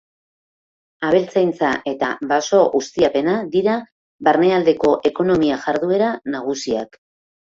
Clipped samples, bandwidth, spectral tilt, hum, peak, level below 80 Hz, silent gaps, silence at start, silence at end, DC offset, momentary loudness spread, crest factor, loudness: under 0.1%; 7.8 kHz; -5 dB/octave; none; -2 dBFS; -56 dBFS; 3.92-4.19 s; 1 s; 0.7 s; under 0.1%; 9 LU; 16 dB; -18 LUFS